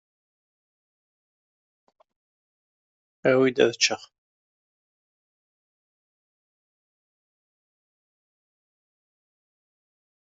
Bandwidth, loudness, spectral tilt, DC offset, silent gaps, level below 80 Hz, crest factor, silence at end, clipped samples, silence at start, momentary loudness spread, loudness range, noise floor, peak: 7.6 kHz; -22 LUFS; -2.5 dB/octave; under 0.1%; none; -78 dBFS; 28 dB; 6.35 s; under 0.1%; 3.25 s; 7 LU; 5 LU; under -90 dBFS; -4 dBFS